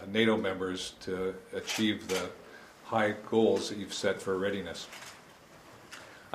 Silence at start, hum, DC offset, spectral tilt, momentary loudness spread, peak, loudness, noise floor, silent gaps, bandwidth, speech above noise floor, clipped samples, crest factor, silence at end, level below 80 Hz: 0 s; none; under 0.1%; -4 dB/octave; 21 LU; -12 dBFS; -32 LUFS; -55 dBFS; none; 15.5 kHz; 23 dB; under 0.1%; 20 dB; 0 s; -68 dBFS